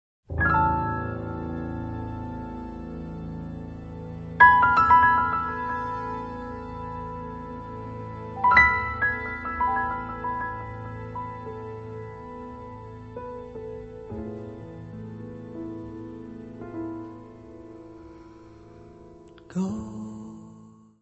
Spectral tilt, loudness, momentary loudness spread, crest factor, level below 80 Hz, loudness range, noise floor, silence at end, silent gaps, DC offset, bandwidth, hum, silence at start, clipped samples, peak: -7 dB/octave; -25 LUFS; 23 LU; 24 dB; -46 dBFS; 18 LU; -50 dBFS; 0.3 s; none; under 0.1%; 8 kHz; none; 0.3 s; under 0.1%; -2 dBFS